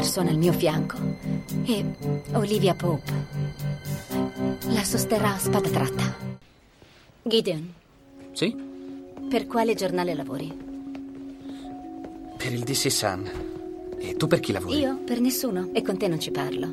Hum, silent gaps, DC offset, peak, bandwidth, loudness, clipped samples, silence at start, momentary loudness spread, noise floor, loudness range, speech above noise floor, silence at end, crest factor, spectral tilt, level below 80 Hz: none; none; under 0.1%; -8 dBFS; 16.5 kHz; -26 LUFS; under 0.1%; 0 s; 15 LU; -54 dBFS; 4 LU; 29 dB; 0 s; 20 dB; -5 dB/octave; -52 dBFS